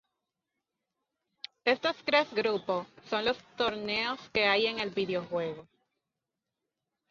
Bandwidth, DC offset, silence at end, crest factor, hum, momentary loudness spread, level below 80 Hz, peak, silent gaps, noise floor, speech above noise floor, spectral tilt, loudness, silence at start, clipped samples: 7.4 kHz; under 0.1%; 1.45 s; 24 dB; none; 9 LU; -70 dBFS; -10 dBFS; none; -88 dBFS; 57 dB; -4.5 dB/octave; -30 LUFS; 1.65 s; under 0.1%